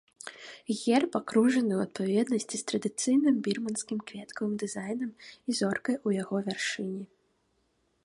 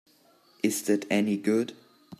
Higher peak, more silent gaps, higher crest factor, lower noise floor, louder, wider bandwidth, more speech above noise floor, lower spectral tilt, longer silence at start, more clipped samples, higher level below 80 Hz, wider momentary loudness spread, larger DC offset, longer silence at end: about the same, -12 dBFS vs -12 dBFS; neither; about the same, 18 dB vs 18 dB; first, -73 dBFS vs -61 dBFS; about the same, -30 LUFS vs -28 LUFS; second, 11.5 kHz vs 14.5 kHz; first, 44 dB vs 35 dB; about the same, -4.5 dB/octave vs -4.5 dB/octave; second, 0.25 s vs 0.65 s; neither; about the same, -74 dBFS vs -76 dBFS; first, 15 LU vs 5 LU; neither; first, 1 s vs 0.05 s